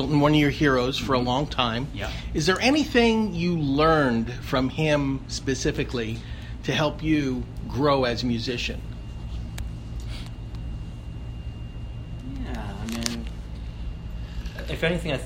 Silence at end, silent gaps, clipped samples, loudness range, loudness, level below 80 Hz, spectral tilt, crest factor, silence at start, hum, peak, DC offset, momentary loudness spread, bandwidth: 0 s; none; under 0.1%; 13 LU; -25 LUFS; -36 dBFS; -5.5 dB/octave; 24 dB; 0 s; none; -2 dBFS; under 0.1%; 17 LU; 16 kHz